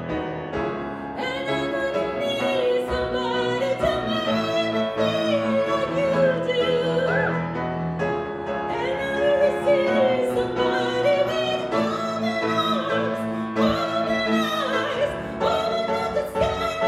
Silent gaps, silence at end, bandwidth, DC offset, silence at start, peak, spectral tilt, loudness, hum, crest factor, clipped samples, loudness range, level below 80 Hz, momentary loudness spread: none; 0 s; 13.5 kHz; under 0.1%; 0 s; -8 dBFS; -5.5 dB/octave; -23 LUFS; none; 16 dB; under 0.1%; 2 LU; -48 dBFS; 7 LU